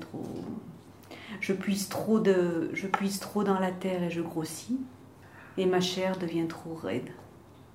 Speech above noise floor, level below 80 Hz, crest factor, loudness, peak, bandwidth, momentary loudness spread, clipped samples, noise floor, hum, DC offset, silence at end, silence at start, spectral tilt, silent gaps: 23 dB; -68 dBFS; 22 dB; -31 LUFS; -10 dBFS; 16 kHz; 18 LU; under 0.1%; -52 dBFS; none; under 0.1%; 0.1 s; 0 s; -5.5 dB/octave; none